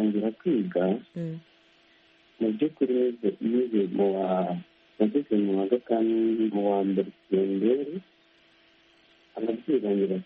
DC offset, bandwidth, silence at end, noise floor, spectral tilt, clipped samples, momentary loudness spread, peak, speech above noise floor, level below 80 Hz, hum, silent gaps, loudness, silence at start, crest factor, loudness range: under 0.1%; 4.5 kHz; 0 s; -61 dBFS; -7.5 dB/octave; under 0.1%; 9 LU; -10 dBFS; 35 dB; -74 dBFS; none; none; -27 LUFS; 0 s; 18 dB; 3 LU